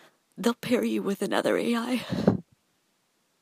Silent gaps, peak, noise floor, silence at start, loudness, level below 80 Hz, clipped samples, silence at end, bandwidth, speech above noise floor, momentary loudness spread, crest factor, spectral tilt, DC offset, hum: none; -6 dBFS; -71 dBFS; 0.35 s; -27 LUFS; -62 dBFS; under 0.1%; 1 s; 15.5 kHz; 45 dB; 4 LU; 22 dB; -5.5 dB/octave; under 0.1%; none